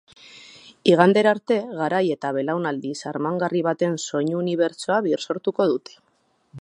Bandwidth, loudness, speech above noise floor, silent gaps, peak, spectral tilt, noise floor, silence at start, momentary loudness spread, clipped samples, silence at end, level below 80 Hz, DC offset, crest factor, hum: 11 kHz; -22 LUFS; 36 dB; none; 0 dBFS; -5.5 dB/octave; -57 dBFS; 0.35 s; 11 LU; under 0.1%; 0 s; -74 dBFS; under 0.1%; 22 dB; none